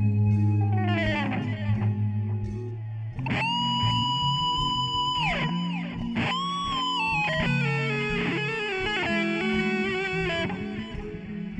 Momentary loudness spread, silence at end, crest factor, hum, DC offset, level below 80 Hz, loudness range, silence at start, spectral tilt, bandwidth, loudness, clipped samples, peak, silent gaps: 9 LU; 0 s; 14 dB; none; under 0.1%; -46 dBFS; 2 LU; 0 s; -6 dB/octave; 8.6 kHz; -26 LUFS; under 0.1%; -12 dBFS; none